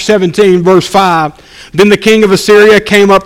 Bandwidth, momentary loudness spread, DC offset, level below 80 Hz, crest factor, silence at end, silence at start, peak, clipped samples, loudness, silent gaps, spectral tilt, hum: 16 kHz; 6 LU; under 0.1%; -40 dBFS; 6 dB; 0 s; 0 s; 0 dBFS; 4%; -6 LUFS; none; -5 dB/octave; none